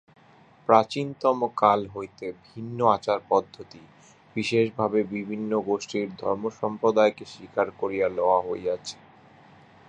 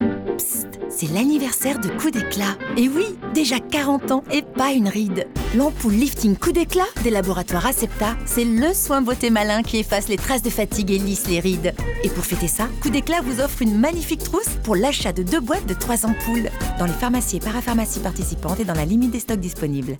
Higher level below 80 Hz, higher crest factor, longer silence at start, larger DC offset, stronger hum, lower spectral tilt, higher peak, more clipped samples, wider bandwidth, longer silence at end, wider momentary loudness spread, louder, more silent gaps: second, -64 dBFS vs -32 dBFS; first, 24 dB vs 12 dB; first, 0.7 s vs 0 s; neither; neither; about the same, -5.5 dB/octave vs -4.5 dB/octave; first, -2 dBFS vs -8 dBFS; neither; second, 9.8 kHz vs over 20 kHz; first, 0.95 s vs 0 s; first, 16 LU vs 5 LU; second, -25 LUFS vs -21 LUFS; neither